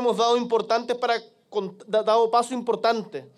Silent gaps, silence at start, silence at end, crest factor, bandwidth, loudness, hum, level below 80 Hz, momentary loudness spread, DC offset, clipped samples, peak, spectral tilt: none; 0 s; 0.1 s; 16 dB; 12 kHz; -24 LUFS; none; -80 dBFS; 11 LU; under 0.1%; under 0.1%; -8 dBFS; -4 dB/octave